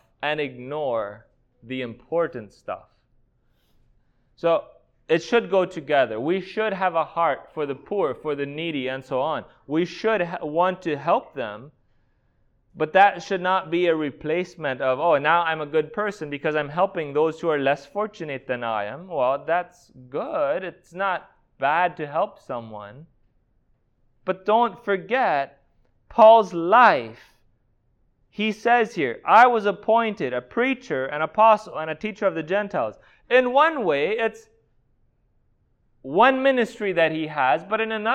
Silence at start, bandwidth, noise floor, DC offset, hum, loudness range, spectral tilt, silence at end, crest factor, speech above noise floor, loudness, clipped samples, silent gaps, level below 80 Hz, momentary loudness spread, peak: 0.2 s; 8.8 kHz; -65 dBFS; under 0.1%; none; 8 LU; -6 dB/octave; 0 s; 20 dB; 43 dB; -22 LUFS; under 0.1%; none; -64 dBFS; 14 LU; -2 dBFS